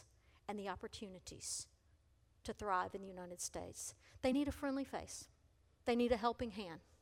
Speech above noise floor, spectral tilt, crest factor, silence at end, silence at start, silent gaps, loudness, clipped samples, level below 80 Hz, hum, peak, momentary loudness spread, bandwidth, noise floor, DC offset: 30 dB; -4 dB/octave; 22 dB; 0.2 s; 0 s; none; -43 LUFS; under 0.1%; -64 dBFS; none; -22 dBFS; 14 LU; 16.5 kHz; -72 dBFS; under 0.1%